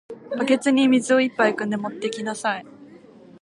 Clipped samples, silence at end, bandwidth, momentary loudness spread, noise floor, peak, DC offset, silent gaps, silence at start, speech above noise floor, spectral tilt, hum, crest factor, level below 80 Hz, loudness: under 0.1%; 0.55 s; 11.5 kHz; 10 LU; -47 dBFS; -4 dBFS; under 0.1%; none; 0.1 s; 26 dB; -4 dB/octave; none; 18 dB; -74 dBFS; -21 LUFS